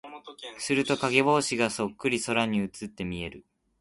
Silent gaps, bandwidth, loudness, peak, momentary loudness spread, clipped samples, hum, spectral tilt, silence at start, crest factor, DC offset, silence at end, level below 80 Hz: none; 11.5 kHz; -27 LUFS; -6 dBFS; 16 LU; under 0.1%; none; -4 dB/octave; 0.05 s; 22 dB; under 0.1%; 0.4 s; -58 dBFS